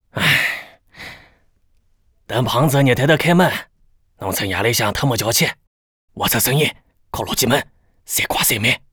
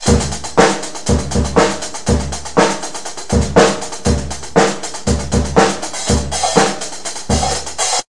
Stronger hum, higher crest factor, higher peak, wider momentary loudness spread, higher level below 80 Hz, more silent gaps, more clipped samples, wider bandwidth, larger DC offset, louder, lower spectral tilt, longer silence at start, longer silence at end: neither; about the same, 16 dB vs 16 dB; about the same, -2 dBFS vs 0 dBFS; first, 15 LU vs 8 LU; second, -46 dBFS vs -26 dBFS; first, 5.67-6.08 s vs none; neither; first, over 20 kHz vs 11.5 kHz; second, under 0.1% vs 4%; about the same, -17 LUFS vs -16 LUFS; about the same, -3.5 dB/octave vs -4 dB/octave; first, 0.15 s vs 0 s; first, 0.15 s vs 0 s